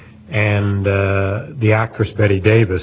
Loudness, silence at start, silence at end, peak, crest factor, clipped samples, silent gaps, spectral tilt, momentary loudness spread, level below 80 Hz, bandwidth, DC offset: -16 LUFS; 0 s; 0 s; 0 dBFS; 16 dB; under 0.1%; none; -11.5 dB/octave; 6 LU; -34 dBFS; 4 kHz; under 0.1%